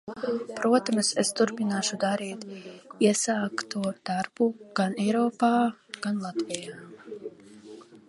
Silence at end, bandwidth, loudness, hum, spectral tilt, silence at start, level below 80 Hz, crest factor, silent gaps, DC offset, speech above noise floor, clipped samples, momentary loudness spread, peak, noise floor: 0.1 s; 11.5 kHz; -27 LUFS; none; -4 dB/octave; 0.05 s; -74 dBFS; 22 dB; none; under 0.1%; 21 dB; under 0.1%; 19 LU; -6 dBFS; -48 dBFS